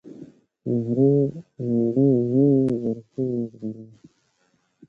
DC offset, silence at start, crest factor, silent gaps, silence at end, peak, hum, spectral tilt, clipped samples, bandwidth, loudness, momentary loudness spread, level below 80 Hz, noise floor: under 0.1%; 0.05 s; 14 dB; none; 1.05 s; -8 dBFS; none; -12 dB/octave; under 0.1%; 2.4 kHz; -22 LUFS; 16 LU; -60 dBFS; -68 dBFS